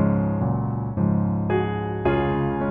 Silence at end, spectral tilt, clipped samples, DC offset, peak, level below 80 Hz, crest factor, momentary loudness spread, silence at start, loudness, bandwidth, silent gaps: 0 s; -11.5 dB/octave; under 0.1%; under 0.1%; -8 dBFS; -40 dBFS; 14 dB; 3 LU; 0 s; -23 LUFS; 3.6 kHz; none